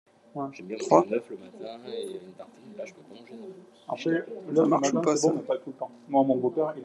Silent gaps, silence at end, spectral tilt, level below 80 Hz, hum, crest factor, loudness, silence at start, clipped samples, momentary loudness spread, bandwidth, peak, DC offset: none; 0 s; -5.5 dB/octave; -82 dBFS; none; 24 dB; -27 LUFS; 0.35 s; under 0.1%; 22 LU; 11.5 kHz; -4 dBFS; under 0.1%